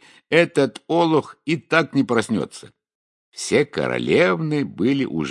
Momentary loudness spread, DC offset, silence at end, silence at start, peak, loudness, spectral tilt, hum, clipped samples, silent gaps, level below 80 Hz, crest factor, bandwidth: 8 LU; under 0.1%; 0 s; 0.3 s; 0 dBFS; -20 LUFS; -5.5 dB/octave; none; under 0.1%; 2.95-3.32 s; -62 dBFS; 20 dB; 11.5 kHz